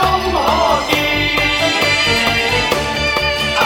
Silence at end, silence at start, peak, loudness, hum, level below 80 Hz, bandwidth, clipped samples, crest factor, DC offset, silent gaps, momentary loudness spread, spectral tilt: 0 s; 0 s; 0 dBFS; -14 LUFS; none; -32 dBFS; 20 kHz; under 0.1%; 14 dB; under 0.1%; none; 3 LU; -3 dB/octave